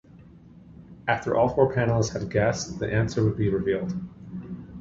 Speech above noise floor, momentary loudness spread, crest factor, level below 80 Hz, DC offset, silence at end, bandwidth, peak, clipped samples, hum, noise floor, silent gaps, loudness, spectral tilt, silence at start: 25 dB; 16 LU; 20 dB; -48 dBFS; under 0.1%; 0 s; 7.8 kHz; -6 dBFS; under 0.1%; none; -49 dBFS; none; -25 LUFS; -6.5 dB/octave; 0.15 s